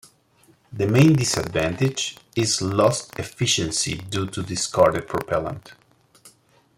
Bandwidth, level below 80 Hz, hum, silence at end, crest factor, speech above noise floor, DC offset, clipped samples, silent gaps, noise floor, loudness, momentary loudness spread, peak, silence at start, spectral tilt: 16.5 kHz; -52 dBFS; none; 0.5 s; 20 dB; 37 dB; under 0.1%; under 0.1%; none; -58 dBFS; -22 LUFS; 11 LU; -4 dBFS; 0.7 s; -4.5 dB/octave